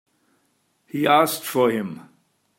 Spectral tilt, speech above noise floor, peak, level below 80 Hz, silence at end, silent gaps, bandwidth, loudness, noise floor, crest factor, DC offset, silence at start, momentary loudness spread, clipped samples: -4 dB/octave; 47 dB; -2 dBFS; -74 dBFS; 0.55 s; none; 16.5 kHz; -21 LUFS; -68 dBFS; 22 dB; under 0.1%; 0.95 s; 16 LU; under 0.1%